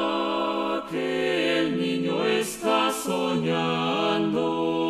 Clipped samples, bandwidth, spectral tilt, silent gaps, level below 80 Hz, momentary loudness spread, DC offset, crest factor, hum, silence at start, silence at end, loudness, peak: under 0.1%; 15 kHz; -4.5 dB/octave; none; -62 dBFS; 3 LU; under 0.1%; 14 dB; none; 0 s; 0 s; -25 LUFS; -10 dBFS